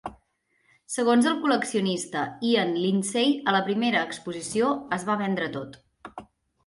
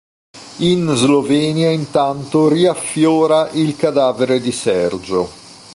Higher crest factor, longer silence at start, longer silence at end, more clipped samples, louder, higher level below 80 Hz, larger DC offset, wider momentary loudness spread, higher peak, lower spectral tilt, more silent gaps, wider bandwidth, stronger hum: about the same, 16 dB vs 14 dB; second, 0.05 s vs 0.35 s; first, 0.4 s vs 0 s; neither; second, -25 LUFS vs -15 LUFS; second, -66 dBFS vs -52 dBFS; neither; first, 17 LU vs 6 LU; second, -10 dBFS vs -2 dBFS; about the same, -4.5 dB/octave vs -5.5 dB/octave; neither; about the same, 11.5 kHz vs 11.5 kHz; neither